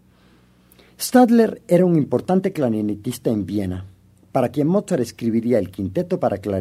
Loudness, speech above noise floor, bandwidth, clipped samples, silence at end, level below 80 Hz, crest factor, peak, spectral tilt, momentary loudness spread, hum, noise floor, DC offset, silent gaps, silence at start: -20 LUFS; 35 dB; 15.5 kHz; under 0.1%; 0 s; -58 dBFS; 18 dB; -2 dBFS; -7 dB/octave; 10 LU; none; -54 dBFS; under 0.1%; none; 1 s